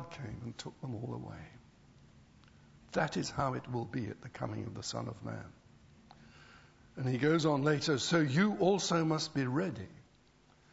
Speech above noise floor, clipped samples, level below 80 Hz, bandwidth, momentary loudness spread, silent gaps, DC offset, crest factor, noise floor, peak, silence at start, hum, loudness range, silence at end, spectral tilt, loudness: 31 dB; under 0.1%; -66 dBFS; 8 kHz; 17 LU; none; under 0.1%; 20 dB; -65 dBFS; -16 dBFS; 0 s; none; 11 LU; 0.7 s; -5.5 dB/octave; -34 LUFS